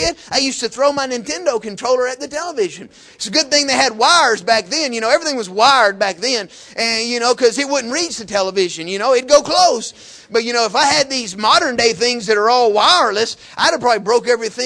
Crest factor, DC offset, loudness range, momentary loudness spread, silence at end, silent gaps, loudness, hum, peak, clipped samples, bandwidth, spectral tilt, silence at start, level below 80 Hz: 16 dB; under 0.1%; 4 LU; 10 LU; 0 s; none; -15 LUFS; none; 0 dBFS; under 0.1%; 11 kHz; -1.5 dB/octave; 0 s; -52 dBFS